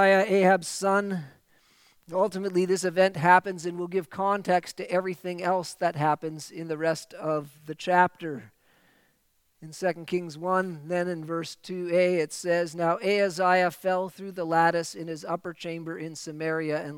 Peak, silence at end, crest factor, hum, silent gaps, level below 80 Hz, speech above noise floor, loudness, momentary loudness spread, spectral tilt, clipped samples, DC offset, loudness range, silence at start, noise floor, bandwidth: -6 dBFS; 0 s; 22 dB; none; none; -76 dBFS; 43 dB; -27 LUFS; 13 LU; -5 dB/octave; under 0.1%; under 0.1%; 5 LU; 0 s; -69 dBFS; 17 kHz